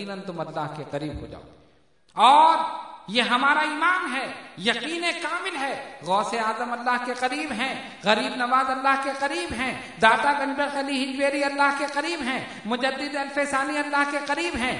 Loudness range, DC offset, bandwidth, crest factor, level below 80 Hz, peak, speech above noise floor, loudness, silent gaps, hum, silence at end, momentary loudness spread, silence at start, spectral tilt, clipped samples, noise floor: 4 LU; under 0.1%; 11 kHz; 22 dB; -56 dBFS; -2 dBFS; 36 dB; -24 LUFS; none; none; 0 s; 12 LU; 0 s; -3 dB/octave; under 0.1%; -61 dBFS